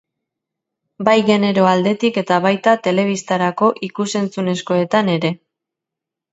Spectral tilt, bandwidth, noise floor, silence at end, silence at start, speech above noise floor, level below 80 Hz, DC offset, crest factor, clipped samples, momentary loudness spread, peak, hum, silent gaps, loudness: -5.5 dB/octave; 8.2 kHz; -84 dBFS; 0.95 s; 1 s; 68 dB; -64 dBFS; under 0.1%; 18 dB; under 0.1%; 7 LU; 0 dBFS; none; none; -17 LUFS